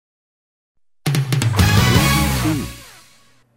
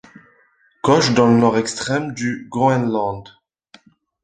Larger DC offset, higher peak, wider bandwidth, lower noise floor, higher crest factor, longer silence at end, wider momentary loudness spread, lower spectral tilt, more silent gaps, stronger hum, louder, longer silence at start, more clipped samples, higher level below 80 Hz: first, 0.2% vs under 0.1%; about the same, 0 dBFS vs -2 dBFS; first, 16.5 kHz vs 9.4 kHz; second, -53 dBFS vs -58 dBFS; about the same, 18 dB vs 18 dB; second, 0.7 s vs 1 s; about the same, 13 LU vs 11 LU; about the same, -4.5 dB/octave vs -5.5 dB/octave; neither; neither; about the same, -17 LUFS vs -18 LUFS; first, 1.05 s vs 0.85 s; neither; first, -30 dBFS vs -54 dBFS